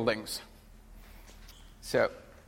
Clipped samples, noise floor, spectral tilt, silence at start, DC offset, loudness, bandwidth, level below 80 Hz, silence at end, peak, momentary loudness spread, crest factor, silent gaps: under 0.1%; -52 dBFS; -4 dB/octave; 0 s; under 0.1%; -32 LUFS; 16 kHz; -54 dBFS; 0.15 s; -12 dBFS; 24 LU; 24 dB; none